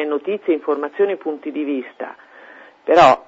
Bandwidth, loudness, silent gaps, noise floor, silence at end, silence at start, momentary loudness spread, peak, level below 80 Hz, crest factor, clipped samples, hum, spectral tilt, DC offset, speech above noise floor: 7.8 kHz; -19 LUFS; none; -43 dBFS; 0.05 s; 0 s; 18 LU; -2 dBFS; -56 dBFS; 18 dB; under 0.1%; none; -5.5 dB/octave; under 0.1%; 26 dB